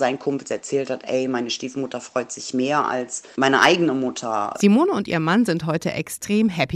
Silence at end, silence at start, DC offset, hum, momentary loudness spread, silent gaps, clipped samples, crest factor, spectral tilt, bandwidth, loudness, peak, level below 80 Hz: 0 s; 0 s; under 0.1%; none; 11 LU; none; under 0.1%; 22 dB; -4.5 dB/octave; 15 kHz; -21 LUFS; 0 dBFS; -58 dBFS